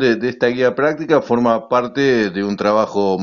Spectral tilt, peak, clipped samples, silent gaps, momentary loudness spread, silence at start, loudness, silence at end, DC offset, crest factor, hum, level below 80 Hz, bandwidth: -4.5 dB/octave; -2 dBFS; under 0.1%; none; 3 LU; 0 s; -17 LUFS; 0 s; under 0.1%; 14 dB; none; -54 dBFS; 7.2 kHz